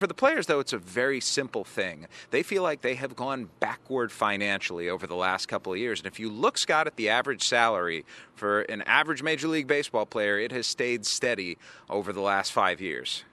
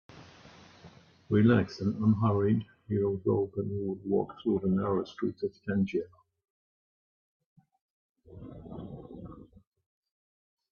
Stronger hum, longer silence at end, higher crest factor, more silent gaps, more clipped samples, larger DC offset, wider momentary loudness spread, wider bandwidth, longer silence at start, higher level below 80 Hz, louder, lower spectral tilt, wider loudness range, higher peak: neither; second, 0.1 s vs 1.25 s; about the same, 22 dB vs 20 dB; second, none vs 6.50-7.40 s, 7.46-7.56 s, 7.81-8.15 s; neither; neither; second, 9 LU vs 20 LU; first, 13 kHz vs 6.8 kHz; second, 0 s vs 0.15 s; second, -70 dBFS vs -62 dBFS; first, -27 LUFS vs -30 LUFS; second, -2.5 dB/octave vs -9.5 dB/octave; second, 4 LU vs 21 LU; first, -6 dBFS vs -12 dBFS